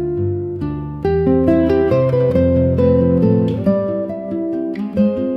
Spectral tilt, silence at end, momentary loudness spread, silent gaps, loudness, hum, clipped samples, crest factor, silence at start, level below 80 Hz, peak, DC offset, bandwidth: -10.5 dB/octave; 0 s; 9 LU; none; -16 LUFS; none; under 0.1%; 12 dB; 0 s; -36 dBFS; -2 dBFS; under 0.1%; 5.8 kHz